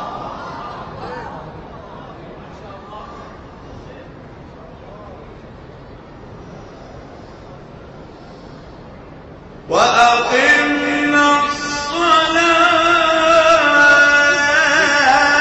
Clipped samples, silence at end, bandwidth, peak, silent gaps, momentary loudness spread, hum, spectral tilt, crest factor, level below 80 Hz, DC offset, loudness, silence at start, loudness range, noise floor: under 0.1%; 0 s; 10 kHz; -2 dBFS; none; 25 LU; none; -2.5 dB/octave; 14 dB; -44 dBFS; under 0.1%; -12 LUFS; 0 s; 26 LU; -37 dBFS